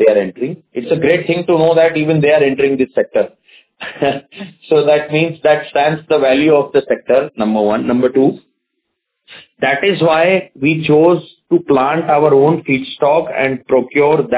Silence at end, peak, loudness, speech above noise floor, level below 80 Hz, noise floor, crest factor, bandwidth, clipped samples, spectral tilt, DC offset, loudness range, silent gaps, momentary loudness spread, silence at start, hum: 0 s; 0 dBFS; -13 LUFS; 59 dB; -54 dBFS; -72 dBFS; 14 dB; 4 kHz; under 0.1%; -10.5 dB/octave; under 0.1%; 3 LU; none; 8 LU; 0 s; none